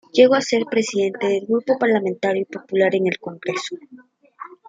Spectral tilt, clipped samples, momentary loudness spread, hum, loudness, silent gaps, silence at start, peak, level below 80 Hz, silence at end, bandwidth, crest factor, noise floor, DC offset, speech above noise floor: -4.5 dB/octave; under 0.1%; 13 LU; none; -20 LUFS; none; 0.15 s; -2 dBFS; -68 dBFS; 0.2 s; 9.2 kHz; 18 dB; -41 dBFS; under 0.1%; 21 dB